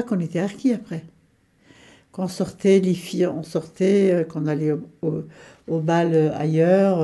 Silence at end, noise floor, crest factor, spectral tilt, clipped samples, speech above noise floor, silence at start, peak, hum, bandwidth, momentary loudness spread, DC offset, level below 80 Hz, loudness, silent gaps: 0 s; -60 dBFS; 16 dB; -7.5 dB/octave; under 0.1%; 39 dB; 0 s; -6 dBFS; none; 12.5 kHz; 13 LU; under 0.1%; -62 dBFS; -22 LUFS; none